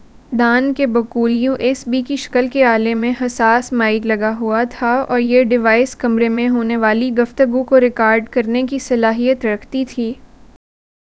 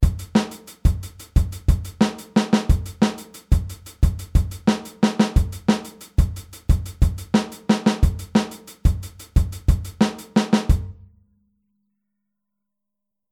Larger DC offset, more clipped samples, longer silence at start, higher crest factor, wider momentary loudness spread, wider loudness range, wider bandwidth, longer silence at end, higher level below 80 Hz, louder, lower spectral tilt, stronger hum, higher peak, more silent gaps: first, 0.2% vs under 0.1%; neither; first, 0.15 s vs 0 s; about the same, 16 dB vs 18 dB; about the same, 7 LU vs 5 LU; about the same, 2 LU vs 2 LU; second, 8 kHz vs 16 kHz; second, 1.05 s vs 2.4 s; second, -48 dBFS vs -24 dBFS; first, -15 LUFS vs -22 LUFS; second, -5 dB/octave vs -6.5 dB/octave; neither; first, 0 dBFS vs -4 dBFS; neither